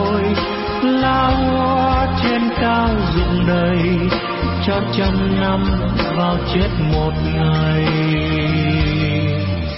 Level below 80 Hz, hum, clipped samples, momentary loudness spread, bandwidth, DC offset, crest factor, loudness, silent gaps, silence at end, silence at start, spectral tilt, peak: -26 dBFS; none; under 0.1%; 3 LU; 5.8 kHz; under 0.1%; 12 dB; -17 LUFS; none; 0 s; 0 s; -10.5 dB/octave; -4 dBFS